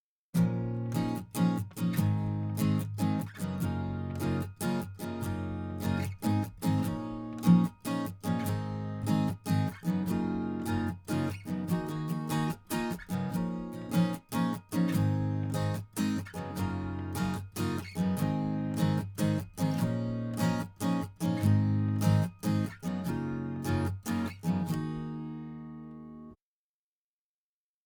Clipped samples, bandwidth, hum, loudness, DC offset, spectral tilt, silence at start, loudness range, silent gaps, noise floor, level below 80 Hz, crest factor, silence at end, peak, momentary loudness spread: under 0.1%; over 20 kHz; none; -32 LUFS; under 0.1%; -7 dB/octave; 0.35 s; 4 LU; none; under -90 dBFS; -58 dBFS; 20 dB; 1.5 s; -12 dBFS; 7 LU